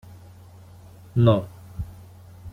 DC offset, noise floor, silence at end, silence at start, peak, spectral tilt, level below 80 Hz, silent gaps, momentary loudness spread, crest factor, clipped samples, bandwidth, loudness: under 0.1%; -46 dBFS; 0.05 s; 1.15 s; -6 dBFS; -9 dB/octave; -48 dBFS; none; 24 LU; 20 dB; under 0.1%; 4.3 kHz; -21 LUFS